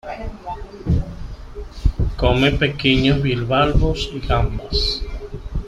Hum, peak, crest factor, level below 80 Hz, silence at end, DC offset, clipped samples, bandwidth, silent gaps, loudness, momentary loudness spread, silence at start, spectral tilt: none; -2 dBFS; 18 dB; -26 dBFS; 0 s; under 0.1%; under 0.1%; 11 kHz; none; -19 LUFS; 16 LU; 0.05 s; -6.5 dB/octave